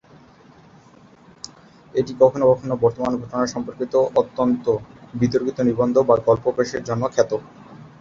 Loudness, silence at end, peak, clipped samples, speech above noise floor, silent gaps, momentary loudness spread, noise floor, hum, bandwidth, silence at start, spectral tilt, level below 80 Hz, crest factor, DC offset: -20 LUFS; 0.15 s; -2 dBFS; under 0.1%; 30 dB; none; 11 LU; -49 dBFS; none; 7.6 kHz; 1.45 s; -6.5 dB/octave; -54 dBFS; 20 dB; under 0.1%